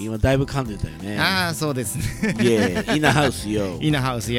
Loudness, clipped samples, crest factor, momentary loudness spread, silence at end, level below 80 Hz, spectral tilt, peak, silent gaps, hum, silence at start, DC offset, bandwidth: -21 LUFS; under 0.1%; 18 dB; 8 LU; 0 s; -36 dBFS; -5 dB/octave; -2 dBFS; none; none; 0 s; under 0.1%; 17 kHz